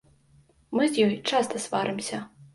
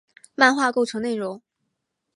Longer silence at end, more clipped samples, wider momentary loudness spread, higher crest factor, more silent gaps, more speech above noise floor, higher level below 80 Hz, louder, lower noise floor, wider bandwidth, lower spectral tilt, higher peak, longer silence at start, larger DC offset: second, 0.1 s vs 0.75 s; neither; second, 10 LU vs 19 LU; about the same, 18 dB vs 22 dB; neither; second, 34 dB vs 57 dB; about the same, -68 dBFS vs -72 dBFS; second, -26 LUFS vs -21 LUFS; second, -60 dBFS vs -78 dBFS; about the same, 11.5 kHz vs 11.5 kHz; about the same, -4 dB/octave vs -3 dB/octave; second, -10 dBFS vs -2 dBFS; first, 0.7 s vs 0.4 s; neither